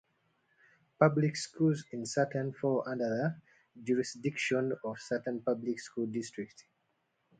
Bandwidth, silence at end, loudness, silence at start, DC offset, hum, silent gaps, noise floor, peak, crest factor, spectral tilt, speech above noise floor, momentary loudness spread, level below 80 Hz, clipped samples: 9.4 kHz; 0.8 s; -33 LUFS; 1 s; under 0.1%; none; none; -78 dBFS; -10 dBFS; 24 dB; -6 dB/octave; 45 dB; 10 LU; -76 dBFS; under 0.1%